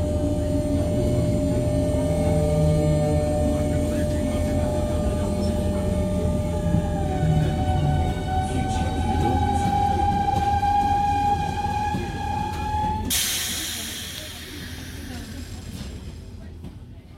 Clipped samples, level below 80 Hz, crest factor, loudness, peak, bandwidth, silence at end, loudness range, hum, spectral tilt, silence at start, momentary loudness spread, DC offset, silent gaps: under 0.1%; -32 dBFS; 14 dB; -23 LUFS; -8 dBFS; 16.5 kHz; 0 s; 5 LU; none; -5.5 dB/octave; 0 s; 14 LU; under 0.1%; none